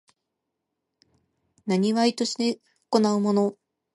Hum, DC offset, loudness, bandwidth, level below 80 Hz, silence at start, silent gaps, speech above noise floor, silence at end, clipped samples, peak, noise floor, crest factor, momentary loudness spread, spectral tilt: none; under 0.1%; -24 LUFS; 11.5 kHz; -74 dBFS; 1.65 s; none; 59 dB; 0.45 s; under 0.1%; -6 dBFS; -82 dBFS; 20 dB; 7 LU; -5.5 dB/octave